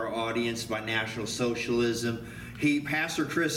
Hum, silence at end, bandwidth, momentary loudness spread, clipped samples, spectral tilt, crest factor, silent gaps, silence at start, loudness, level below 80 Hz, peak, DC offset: none; 0 s; 17 kHz; 5 LU; under 0.1%; -4.5 dB/octave; 16 dB; none; 0 s; -29 LUFS; -56 dBFS; -14 dBFS; under 0.1%